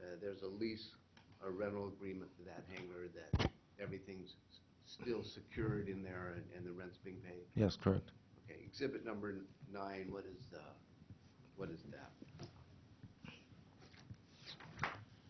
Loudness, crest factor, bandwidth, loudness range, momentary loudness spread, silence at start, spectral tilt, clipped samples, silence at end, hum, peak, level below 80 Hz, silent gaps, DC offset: -46 LUFS; 26 dB; 6.2 kHz; 13 LU; 22 LU; 0 s; -5.5 dB/octave; under 0.1%; 0 s; none; -22 dBFS; -60 dBFS; none; under 0.1%